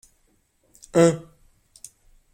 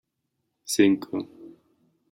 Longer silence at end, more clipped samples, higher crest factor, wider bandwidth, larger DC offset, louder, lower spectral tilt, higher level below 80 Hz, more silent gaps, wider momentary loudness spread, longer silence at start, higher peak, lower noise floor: first, 1.15 s vs 0.65 s; neither; about the same, 22 dB vs 22 dB; about the same, 15.5 kHz vs 16.5 kHz; neither; first, -21 LUFS vs -24 LUFS; first, -6 dB/octave vs -4 dB/octave; first, -58 dBFS vs -74 dBFS; neither; first, 26 LU vs 21 LU; first, 0.95 s vs 0.7 s; about the same, -4 dBFS vs -6 dBFS; second, -65 dBFS vs -79 dBFS